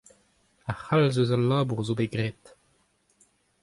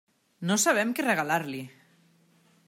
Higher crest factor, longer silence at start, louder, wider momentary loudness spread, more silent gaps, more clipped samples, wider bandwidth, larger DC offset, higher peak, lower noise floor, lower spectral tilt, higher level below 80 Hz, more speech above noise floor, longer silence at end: about the same, 18 dB vs 18 dB; first, 0.65 s vs 0.4 s; about the same, -26 LUFS vs -26 LUFS; about the same, 13 LU vs 15 LU; neither; neither; second, 11.5 kHz vs 16 kHz; neither; about the same, -10 dBFS vs -12 dBFS; first, -68 dBFS vs -63 dBFS; first, -7 dB/octave vs -3.5 dB/octave; first, -58 dBFS vs -80 dBFS; first, 43 dB vs 37 dB; first, 1.3 s vs 1 s